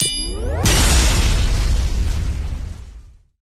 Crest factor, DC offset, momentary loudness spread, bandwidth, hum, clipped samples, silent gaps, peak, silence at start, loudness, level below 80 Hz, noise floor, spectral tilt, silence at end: 14 dB; under 0.1%; 15 LU; 14.5 kHz; none; under 0.1%; none; -4 dBFS; 0 s; -19 LUFS; -20 dBFS; -41 dBFS; -3.5 dB/octave; 0.35 s